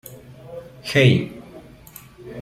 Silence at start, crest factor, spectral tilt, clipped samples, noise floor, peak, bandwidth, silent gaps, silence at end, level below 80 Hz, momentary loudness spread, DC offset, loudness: 0.1 s; 20 dB; -6 dB/octave; under 0.1%; -44 dBFS; -2 dBFS; 15 kHz; none; 0 s; -54 dBFS; 27 LU; under 0.1%; -18 LUFS